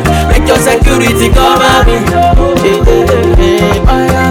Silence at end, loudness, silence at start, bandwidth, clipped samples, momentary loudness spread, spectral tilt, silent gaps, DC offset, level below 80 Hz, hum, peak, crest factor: 0 s; -8 LUFS; 0 s; 17 kHz; under 0.1%; 3 LU; -5.5 dB/octave; none; 0.2%; -12 dBFS; none; 0 dBFS; 6 dB